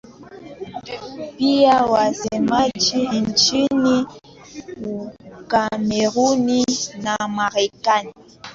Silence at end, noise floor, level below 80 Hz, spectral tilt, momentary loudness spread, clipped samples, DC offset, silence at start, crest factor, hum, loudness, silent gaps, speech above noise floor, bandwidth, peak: 0 s; -39 dBFS; -54 dBFS; -3.5 dB/octave; 19 LU; under 0.1%; under 0.1%; 0.1 s; 16 dB; none; -18 LUFS; none; 21 dB; 7.8 kHz; -4 dBFS